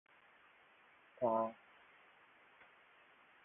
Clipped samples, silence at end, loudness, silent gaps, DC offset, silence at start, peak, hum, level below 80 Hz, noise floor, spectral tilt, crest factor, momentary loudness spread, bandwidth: under 0.1%; 1.9 s; -39 LUFS; none; under 0.1%; 1.2 s; -24 dBFS; none; -88 dBFS; -67 dBFS; -2 dB/octave; 22 dB; 28 LU; 3.7 kHz